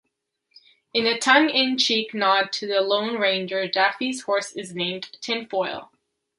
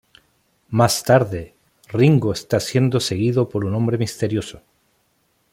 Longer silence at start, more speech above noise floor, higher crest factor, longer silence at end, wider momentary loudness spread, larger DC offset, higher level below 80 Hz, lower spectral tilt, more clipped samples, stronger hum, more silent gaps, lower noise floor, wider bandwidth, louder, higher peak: first, 0.95 s vs 0.7 s; first, 51 dB vs 47 dB; about the same, 22 dB vs 18 dB; second, 0.55 s vs 0.95 s; about the same, 11 LU vs 10 LU; neither; second, -72 dBFS vs -52 dBFS; second, -2.5 dB/octave vs -6 dB/octave; neither; neither; neither; first, -74 dBFS vs -65 dBFS; second, 11.5 kHz vs 16.5 kHz; second, -22 LUFS vs -19 LUFS; about the same, -2 dBFS vs -2 dBFS